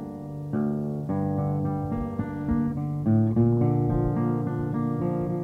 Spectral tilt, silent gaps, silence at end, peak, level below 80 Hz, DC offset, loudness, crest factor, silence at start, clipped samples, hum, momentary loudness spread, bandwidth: -11.5 dB/octave; none; 0 s; -10 dBFS; -44 dBFS; under 0.1%; -26 LUFS; 14 dB; 0 s; under 0.1%; none; 8 LU; 3.1 kHz